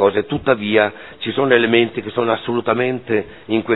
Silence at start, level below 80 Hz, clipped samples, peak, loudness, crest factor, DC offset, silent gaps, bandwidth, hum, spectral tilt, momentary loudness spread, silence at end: 0 s; -52 dBFS; under 0.1%; 0 dBFS; -18 LUFS; 18 dB; 0.4%; none; 4.1 kHz; none; -9 dB/octave; 8 LU; 0 s